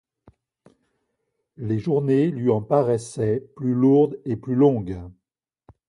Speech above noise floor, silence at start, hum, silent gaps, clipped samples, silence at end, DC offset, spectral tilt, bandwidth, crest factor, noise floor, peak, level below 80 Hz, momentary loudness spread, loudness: 56 dB; 1.6 s; none; none; under 0.1%; 0.8 s; under 0.1%; -8.5 dB/octave; 11 kHz; 18 dB; -76 dBFS; -6 dBFS; -54 dBFS; 11 LU; -21 LUFS